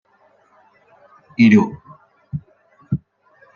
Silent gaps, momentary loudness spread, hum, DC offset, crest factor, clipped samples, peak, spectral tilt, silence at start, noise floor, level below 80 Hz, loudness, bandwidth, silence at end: none; 20 LU; none; under 0.1%; 20 dB; under 0.1%; -2 dBFS; -7.5 dB/octave; 1.4 s; -57 dBFS; -54 dBFS; -17 LUFS; 7 kHz; 0.6 s